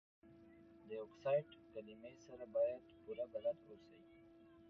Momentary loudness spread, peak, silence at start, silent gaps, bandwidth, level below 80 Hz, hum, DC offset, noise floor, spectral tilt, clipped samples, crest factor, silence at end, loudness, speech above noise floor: 24 LU; -28 dBFS; 0.25 s; none; 6.4 kHz; -80 dBFS; none; under 0.1%; -64 dBFS; -5.5 dB/octave; under 0.1%; 20 dB; 0 s; -45 LUFS; 20 dB